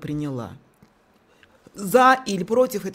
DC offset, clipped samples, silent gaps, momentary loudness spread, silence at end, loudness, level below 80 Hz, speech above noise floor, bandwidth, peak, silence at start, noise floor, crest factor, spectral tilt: under 0.1%; under 0.1%; none; 18 LU; 0 s; -20 LUFS; -60 dBFS; 38 dB; 16 kHz; -4 dBFS; 0 s; -59 dBFS; 20 dB; -5 dB/octave